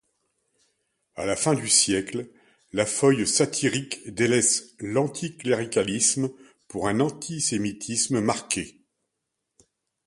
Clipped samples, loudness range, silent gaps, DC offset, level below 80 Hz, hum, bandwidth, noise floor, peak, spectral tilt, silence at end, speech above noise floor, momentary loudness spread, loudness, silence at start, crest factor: under 0.1%; 4 LU; none; under 0.1%; -60 dBFS; none; 11.5 kHz; -81 dBFS; -4 dBFS; -3 dB/octave; 1.35 s; 57 dB; 13 LU; -24 LUFS; 1.15 s; 22 dB